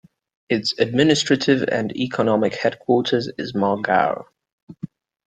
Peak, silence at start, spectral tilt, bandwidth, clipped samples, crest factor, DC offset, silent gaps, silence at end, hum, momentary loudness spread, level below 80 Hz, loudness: -2 dBFS; 0.5 s; -5 dB/octave; 9.2 kHz; under 0.1%; 18 dB; under 0.1%; 4.52-4.67 s; 0.4 s; none; 13 LU; -60 dBFS; -20 LUFS